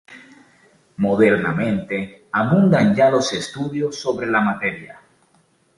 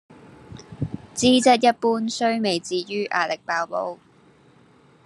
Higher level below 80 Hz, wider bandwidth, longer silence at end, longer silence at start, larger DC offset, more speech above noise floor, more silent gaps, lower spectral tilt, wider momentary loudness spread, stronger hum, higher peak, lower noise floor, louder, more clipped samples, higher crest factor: about the same, -56 dBFS vs -60 dBFS; about the same, 11.5 kHz vs 12 kHz; second, 0.85 s vs 1.1 s; second, 0.1 s vs 0.5 s; neither; first, 41 dB vs 33 dB; neither; first, -6 dB/octave vs -4 dB/octave; second, 10 LU vs 16 LU; neither; about the same, -2 dBFS vs -4 dBFS; first, -60 dBFS vs -54 dBFS; first, -19 LUFS vs -22 LUFS; neither; about the same, 18 dB vs 20 dB